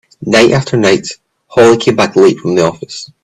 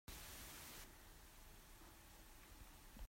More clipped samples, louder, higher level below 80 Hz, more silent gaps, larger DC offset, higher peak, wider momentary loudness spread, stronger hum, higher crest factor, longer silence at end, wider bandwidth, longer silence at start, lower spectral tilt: neither; first, -10 LUFS vs -59 LUFS; first, -48 dBFS vs -62 dBFS; neither; neither; first, 0 dBFS vs -42 dBFS; first, 11 LU vs 8 LU; neither; second, 10 dB vs 16 dB; first, 0.2 s vs 0 s; second, 12 kHz vs 16 kHz; about the same, 0.2 s vs 0.1 s; first, -5 dB/octave vs -2.5 dB/octave